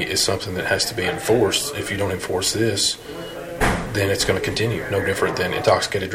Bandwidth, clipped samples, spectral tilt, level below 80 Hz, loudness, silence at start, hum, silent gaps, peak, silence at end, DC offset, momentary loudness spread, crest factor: 16.5 kHz; under 0.1%; -3.5 dB/octave; -40 dBFS; -21 LUFS; 0 s; none; none; -4 dBFS; 0 s; under 0.1%; 6 LU; 18 dB